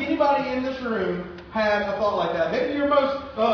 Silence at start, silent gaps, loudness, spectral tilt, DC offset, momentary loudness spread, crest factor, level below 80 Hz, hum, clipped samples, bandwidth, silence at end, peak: 0 s; none; -24 LUFS; -6.5 dB/octave; under 0.1%; 6 LU; 16 dB; -52 dBFS; none; under 0.1%; 5.4 kHz; 0 s; -8 dBFS